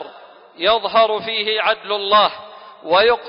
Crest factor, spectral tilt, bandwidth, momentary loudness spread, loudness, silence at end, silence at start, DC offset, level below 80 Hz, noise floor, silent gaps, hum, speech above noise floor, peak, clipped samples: 16 dB; -7.5 dB/octave; 5.4 kHz; 13 LU; -17 LUFS; 0 s; 0 s; under 0.1%; -56 dBFS; -42 dBFS; none; none; 25 dB; -2 dBFS; under 0.1%